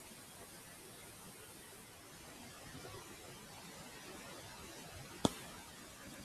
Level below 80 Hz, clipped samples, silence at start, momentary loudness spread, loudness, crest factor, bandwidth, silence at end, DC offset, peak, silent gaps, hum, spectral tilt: -68 dBFS; under 0.1%; 0 s; 14 LU; -49 LUFS; 36 dB; 15.5 kHz; 0 s; under 0.1%; -12 dBFS; none; none; -3.5 dB/octave